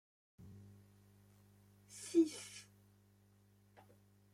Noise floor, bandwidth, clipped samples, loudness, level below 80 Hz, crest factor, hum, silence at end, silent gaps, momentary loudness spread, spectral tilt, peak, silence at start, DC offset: -69 dBFS; 14 kHz; under 0.1%; -38 LUFS; -82 dBFS; 22 dB; 50 Hz at -65 dBFS; 1.7 s; none; 28 LU; -4.5 dB/octave; -22 dBFS; 0.4 s; under 0.1%